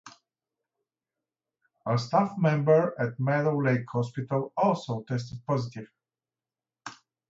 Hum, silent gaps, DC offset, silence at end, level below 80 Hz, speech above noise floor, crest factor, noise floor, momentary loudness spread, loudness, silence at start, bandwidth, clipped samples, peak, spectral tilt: none; none; under 0.1%; 0.35 s; -70 dBFS; over 64 dB; 18 dB; under -90 dBFS; 18 LU; -27 LUFS; 0.05 s; 7.8 kHz; under 0.1%; -10 dBFS; -7.5 dB/octave